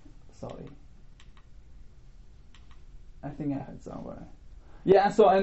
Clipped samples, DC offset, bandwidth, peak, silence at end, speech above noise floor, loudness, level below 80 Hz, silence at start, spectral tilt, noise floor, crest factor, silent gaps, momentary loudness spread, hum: under 0.1%; 0.2%; 8 kHz; -6 dBFS; 0 s; 26 dB; -25 LUFS; -50 dBFS; 0.4 s; -5.5 dB/octave; -51 dBFS; 24 dB; none; 25 LU; none